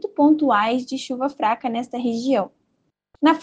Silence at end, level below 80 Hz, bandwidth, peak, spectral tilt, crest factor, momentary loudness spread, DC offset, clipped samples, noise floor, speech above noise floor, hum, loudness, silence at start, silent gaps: 0 s; -68 dBFS; 9 kHz; -4 dBFS; -5 dB/octave; 16 dB; 9 LU; under 0.1%; under 0.1%; -71 dBFS; 50 dB; none; -21 LUFS; 0.05 s; none